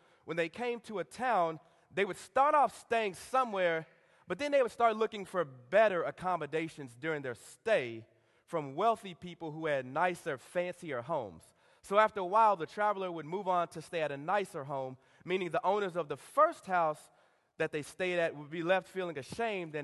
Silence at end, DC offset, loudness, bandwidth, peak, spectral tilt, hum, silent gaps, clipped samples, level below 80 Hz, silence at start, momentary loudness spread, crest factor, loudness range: 0 s; under 0.1%; -33 LUFS; 12.5 kHz; -12 dBFS; -5 dB/octave; none; none; under 0.1%; -74 dBFS; 0.25 s; 12 LU; 22 dB; 4 LU